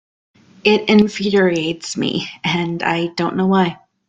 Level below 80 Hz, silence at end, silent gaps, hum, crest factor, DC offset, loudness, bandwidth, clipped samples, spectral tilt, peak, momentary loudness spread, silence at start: -56 dBFS; 0.35 s; none; none; 16 dB; under 0.1%; -17 LUFS; 9.2 kHz; under 0.1%; -5.5 dB/octave; -2 dBFS; 8 LU; 0.65 s